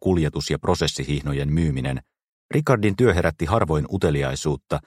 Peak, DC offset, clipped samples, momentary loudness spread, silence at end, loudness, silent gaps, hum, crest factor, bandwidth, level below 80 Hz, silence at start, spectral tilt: -2 dBFS; under 0.1%; under 0.1%; 7 LU; 0.05 s; -22 LUFS; 2.29-2.49 s; none; 20 dB; 15 kHz; -36 dBFS; 0 s; -6 dB/octave